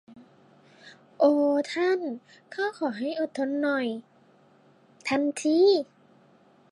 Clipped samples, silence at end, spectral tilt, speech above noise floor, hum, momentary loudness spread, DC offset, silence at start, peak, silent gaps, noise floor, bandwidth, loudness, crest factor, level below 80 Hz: under 0.1%; 0.85 s; -4 dB/octave; 34 dB; none; 15 LU; under 0.1%; 0.1 s; -10 dBFS; none; -59 dBFS; 11.5 kHz; -26 LUFS; 18 dB; -80 dBFS